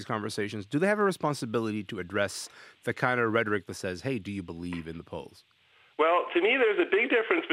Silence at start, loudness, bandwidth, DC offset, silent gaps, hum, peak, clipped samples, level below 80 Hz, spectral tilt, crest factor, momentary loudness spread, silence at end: 0 s; -28 LUFS; 15.5 kHz; under 0.1%; none; none; -8 dBFS; under 0.1%; -70 dBFS; -5 dB/octave; 20 dB; 14 LU; 0 s